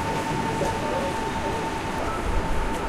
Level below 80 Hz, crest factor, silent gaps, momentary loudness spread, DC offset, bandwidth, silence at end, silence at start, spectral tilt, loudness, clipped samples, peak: -32 dBFS; 14 dB; none; 2 LU; under 0.1%; 15.5 kHz; 0 s; 0 s; -5 dB/octave; -27 LUFS; under 0.1%; -12 dBFS